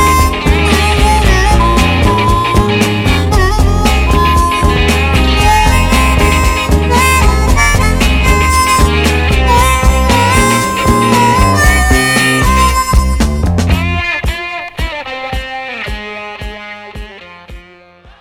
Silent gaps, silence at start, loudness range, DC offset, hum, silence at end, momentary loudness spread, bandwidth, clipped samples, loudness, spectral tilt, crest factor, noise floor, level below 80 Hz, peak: none; 0 s; 8 LU; under 0.1%; none; 0.6 s; 11 LU; 18.5 kHz; 0.3%; -10 LUFS; -4.5 dB/octave; 10 dB; -39 dBFS; -14 dBFS; 0 dBFS